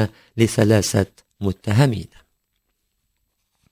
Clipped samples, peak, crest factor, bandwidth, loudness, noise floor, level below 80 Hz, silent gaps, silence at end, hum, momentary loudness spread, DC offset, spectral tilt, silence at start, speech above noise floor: under 0.1%; -2 dBFS; 20 dB; 16 kHz; -20 LUFS; -72 dBFS; -42 dBFS; none; 1.65 s; none; 11 LU; under 0.1%; -6 dB/octave; 0 s; 53 dB